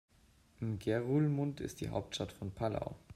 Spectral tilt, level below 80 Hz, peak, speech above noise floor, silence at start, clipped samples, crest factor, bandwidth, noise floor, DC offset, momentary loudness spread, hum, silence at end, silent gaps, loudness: -6.5 dB/octave; -60 dBFS; -20 dBFS; 30 dB; 0.6 s; under 0.1%; 16 dB; 14.5 kHz; -67 dBFS; under 0.1%; 10 LU; none; 0 s; none; -37 LUFS